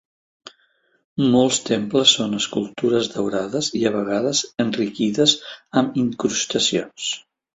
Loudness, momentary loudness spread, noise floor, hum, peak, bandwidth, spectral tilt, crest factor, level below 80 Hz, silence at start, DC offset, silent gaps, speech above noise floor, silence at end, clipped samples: -20 LUFS; 8 LU; -63 dBFS; none; -2 dBFS; 8.2 kHz; -3.5 dB/octave; 20 dB; -60 dBFS; 0.45 s; under 0.1%; 1.04-1.16 s; 43 dB; 0.35 s; under 0.1%